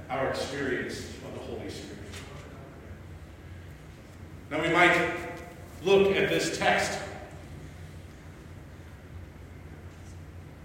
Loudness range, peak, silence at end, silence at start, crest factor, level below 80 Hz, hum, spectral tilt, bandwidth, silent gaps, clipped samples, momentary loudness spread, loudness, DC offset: 17 LU; -8 dBFS; 0 s; 0 s; 24 dB; -52 dBFS; none; -4.5 dB/octave; 16 kHz; none; under 0.1%; 24 LU; -27 LUFS; under 0.1%